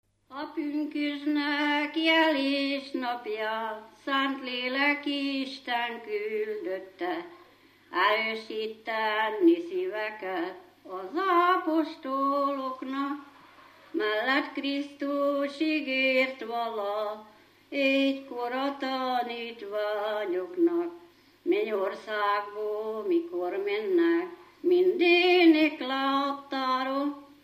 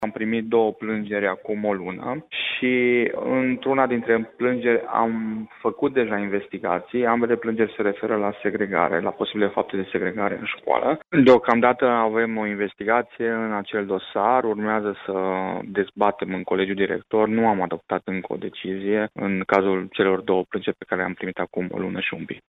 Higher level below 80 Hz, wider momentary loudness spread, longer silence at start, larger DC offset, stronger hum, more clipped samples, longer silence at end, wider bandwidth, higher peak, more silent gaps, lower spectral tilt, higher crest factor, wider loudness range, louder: second, -80 dBFS vs -62 dBFS; first, 11 LU vs 8 LU; first, 0.3 s vs 0 s; neither; neither; neither; about the same, 0.2 s vs 0.1 s; first, 15 kHz vs 7 kHz; second, -10 dBFS vs -4 dBFS; neither; second, -4 dB/octave vs -8 dB/octave; about the same, 18 dB vs 18 dB; about the same, 6 LU vs 4 LU; second, -28 LUFS vs -23 LUFS